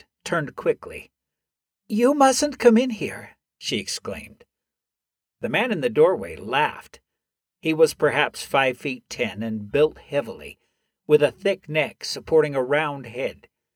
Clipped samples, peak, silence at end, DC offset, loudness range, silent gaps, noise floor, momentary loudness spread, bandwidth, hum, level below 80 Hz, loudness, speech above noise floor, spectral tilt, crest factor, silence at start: under 0.1%; -2 dBFS; 0.45 s; under 0.1%; 3 LU; none; -88 dBFS; 14 LU; 16.5 kHz; none; -58 dBFS; -22 LUFS; 65 dB; -4.5 dB/octave; 22 dB; 0.25 s